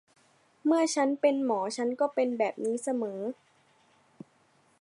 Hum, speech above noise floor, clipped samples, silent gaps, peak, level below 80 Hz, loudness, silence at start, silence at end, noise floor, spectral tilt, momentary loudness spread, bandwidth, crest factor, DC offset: none; 38 dB; under 0.1%; none; -12 dBFS; -86 dBFS; -29 LUFS; 0.65 s; 1.5 s; -66 dBFS; -4 dB/octave; 9 LU; 11.5 kHz; 18 dB; under 0.1%